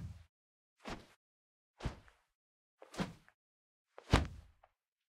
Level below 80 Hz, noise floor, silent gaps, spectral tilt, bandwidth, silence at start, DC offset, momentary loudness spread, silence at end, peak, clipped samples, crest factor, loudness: -50 dBFS; -74 dBFS; 0.29-0.76 s, 1.16-1.74 s, 2.35-2.78 s, 3.34-3.85 s; -5.5 dB/octave; 15 kHz; 0 s; under 0.1%; 24 LU; 0.7 s; -12 dBFS; under 0.1%; 32 dB; -41 LUFS